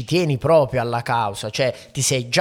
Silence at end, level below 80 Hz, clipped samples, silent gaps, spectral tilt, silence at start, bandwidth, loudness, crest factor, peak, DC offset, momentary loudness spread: 0 s; -50 dBFS; under 0.1%; none; -4.5 dB/octave; 0 s; 17 kHz; -20 LUFS; 16 dB; -4 dBFS; under 0.1%; 6 LU